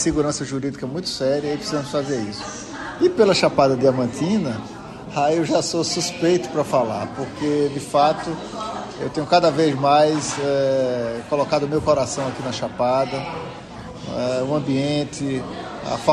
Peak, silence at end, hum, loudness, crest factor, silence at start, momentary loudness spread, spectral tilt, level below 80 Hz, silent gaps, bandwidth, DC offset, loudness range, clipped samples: -4 dBFS; 0 s; none; -21 LUFS; 18 dB; 0 s; 13 LU; -5 dB/octave; -50 dBFS; none; 12 kHz; under 0.1%; 4 LU; under 0.1%